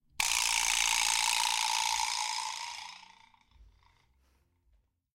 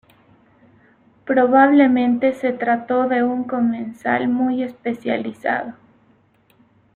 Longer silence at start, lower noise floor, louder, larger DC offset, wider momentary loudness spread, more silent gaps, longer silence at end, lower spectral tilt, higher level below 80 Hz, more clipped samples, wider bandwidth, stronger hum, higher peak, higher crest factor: second, 0.2 s vs 1.25 s; first, -71 dBFS vs -57 dBFS; second, -28 LUFS vs -19 LUFS; neither; about the same, 13 LU vs 12 LU; neither; first, 1.5 s vs 1.25 s; second, 3.5 dB/octave vs -7.5 dB/octave; about the same, -60 dBFS vs -62 dBFS; neither; first, 17 kHz vs 4.3 kHz; neither; second, -12 dBFS vs -4 dBFS; first, 22 dB vs 16 dB